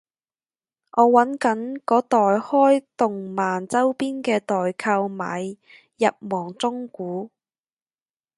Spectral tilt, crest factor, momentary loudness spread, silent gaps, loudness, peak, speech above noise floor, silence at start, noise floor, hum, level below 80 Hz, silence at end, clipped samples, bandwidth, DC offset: -5.5 dB/octave; 22 dB; 13 LU; none; -22 LUFS; -2 dBFS; over 69 dB; 0.95 s; under -90 dBFS; none; -74 dBFS; 1.1 s; under 0.1%; 11.5 kHz; under 0.1%